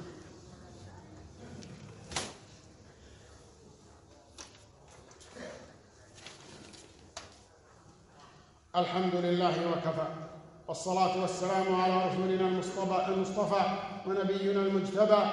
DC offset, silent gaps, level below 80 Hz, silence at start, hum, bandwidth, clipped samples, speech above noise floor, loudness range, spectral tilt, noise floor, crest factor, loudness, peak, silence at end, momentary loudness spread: under 0.1%; none; -64 dBFS; 0 s; none; 11.5 kHz; under 0.1%; 29 dB; 21 LU; -5.5 dB/octave; -59 dBFS; 22 dB; -31 LUFS; -10 dBFS; 0 s; 23 LU